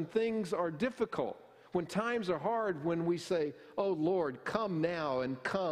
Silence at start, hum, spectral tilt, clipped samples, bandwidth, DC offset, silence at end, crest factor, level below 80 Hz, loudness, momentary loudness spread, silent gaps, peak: 0 s; none; -6.5 dB/octave; under 0.1%; 13.5 kHz; under 0.1%; 0 s; 20 dB; -70 dBFS; -35 LUFS; 5 LU; none; -16 dBFS